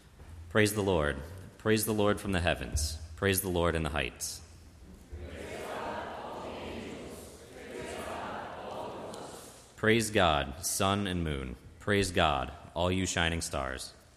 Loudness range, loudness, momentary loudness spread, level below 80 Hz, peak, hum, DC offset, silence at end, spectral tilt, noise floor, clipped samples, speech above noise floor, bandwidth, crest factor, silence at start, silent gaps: 12 LU; -31 LUFS; 17 LU; -46 dBFS; -10 dBFS; none; under 0.1%; 0.15 s; -4 dB/octave; -52 dBFS; under 0.1%; 22 dB; 15.5 kHz; 22 dB; 0.05 s; none